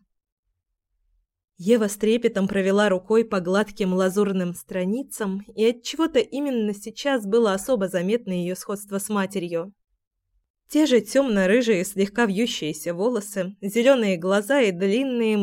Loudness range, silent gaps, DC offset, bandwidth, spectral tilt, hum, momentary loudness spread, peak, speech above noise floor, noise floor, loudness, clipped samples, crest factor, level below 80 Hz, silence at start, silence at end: 3 LU; 10.07-10.11 s, 10.50-10.54 s; under 0.1%; 16.5 kHz; -5 dB/octave; none; 9 LU; -4 dBFS; 56 dB; -78 dBFS; -23 LUFS; under 0.1%; 18 dB; -60 dBFS; 1.6 s; 0 s